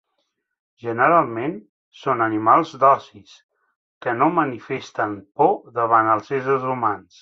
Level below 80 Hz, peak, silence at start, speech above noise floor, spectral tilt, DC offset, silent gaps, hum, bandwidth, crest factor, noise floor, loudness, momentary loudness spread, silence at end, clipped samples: -66 dBFS; -2 dBFS; 0.85 s; 54 dB; -7 dB/octave; under 0.1%; 1.69-1.92 s, 3.43-3.49 s, 3.76-4.01 s; none; 7.6 kHz; 18 dB; -74 dBFS; -20 LUFS; 13 LU; 0.2 s; under 0.1%